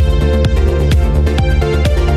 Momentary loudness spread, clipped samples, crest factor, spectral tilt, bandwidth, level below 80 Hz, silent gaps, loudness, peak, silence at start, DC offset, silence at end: 1 LU; under 0.1%; 8 dB; -7 dB/octave; 12.5 kHz; -12 dBFS; none; -13 LUFS; -2 dBFS; 0 s; under 0.1%; 0 s